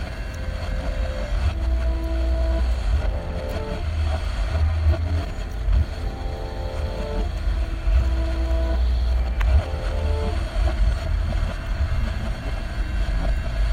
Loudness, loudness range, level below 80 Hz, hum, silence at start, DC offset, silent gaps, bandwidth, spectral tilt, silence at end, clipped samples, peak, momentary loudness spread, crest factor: -25 LUFS; 2 LU; -22 dBFS; none; 0 s; under 0.1%; none; 9.6 kHz; -7 dB/octave; 0 s; under 0.1%; -8 dBFS; 7 LU; 14 dB